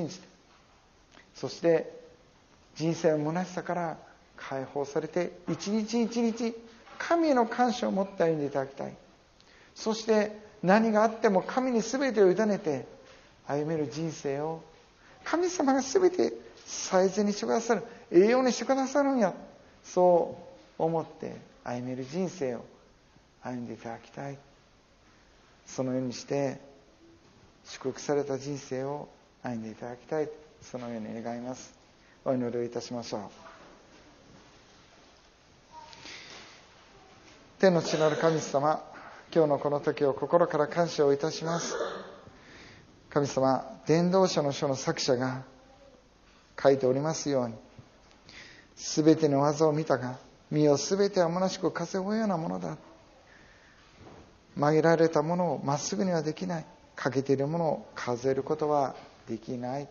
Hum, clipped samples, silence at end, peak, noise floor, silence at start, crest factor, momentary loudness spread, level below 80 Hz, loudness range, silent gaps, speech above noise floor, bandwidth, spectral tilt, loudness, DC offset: none; under 0.1%; 0 s; -8 dBFS; -61 dBFS; 0 s; 22 dB; 18 LU; -66 dBFS; 11 LU; none; 33 dB; 7.2 kHz; -5.5 dB/octave; -29 LUFS; under 0.1%